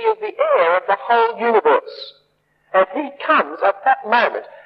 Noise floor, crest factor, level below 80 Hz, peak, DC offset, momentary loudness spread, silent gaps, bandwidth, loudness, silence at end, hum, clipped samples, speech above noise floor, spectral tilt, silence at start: -62 dBFS; 16 dB; -76 dBFS; -2 dBFS; under 0.1%; 6 LU; none; 5.8 kHz; -17 LUFS; 0.2 s; none; under 0.1%; 45 dB; -6 dB/octave; 0 s